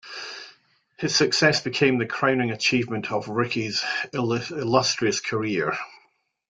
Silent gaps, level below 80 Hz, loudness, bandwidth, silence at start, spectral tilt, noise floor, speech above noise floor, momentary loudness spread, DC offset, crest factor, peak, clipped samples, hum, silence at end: none; -64 dBFS; -23 LUFS; 9.6 kHz; 0.05 s; -4 dB/octave; -65 dBFS; 42 dB; 12 LU; under 0.1%; 20 dB; -4 dBFS; under 0.1%; none; 0.55 s